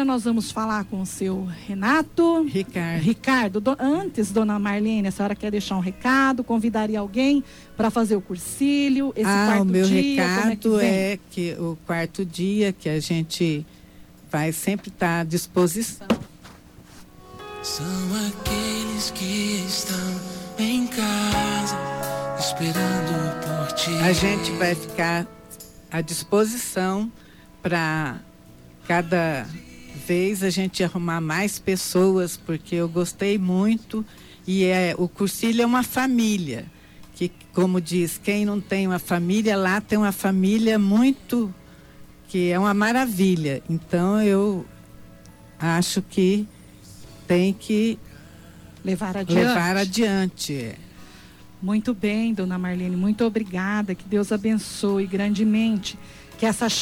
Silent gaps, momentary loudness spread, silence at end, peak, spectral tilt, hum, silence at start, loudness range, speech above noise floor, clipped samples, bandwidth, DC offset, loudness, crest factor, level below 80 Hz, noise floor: none; 10 LU; 0 s; -8 dBFS; -5 dB/octave; none; 0 s; 5 LU; 25 dB; under 0.1%; 17 kHz; under 0.1%; -23 LUFS; 16 dB; -50 dBFS; -47 dBFS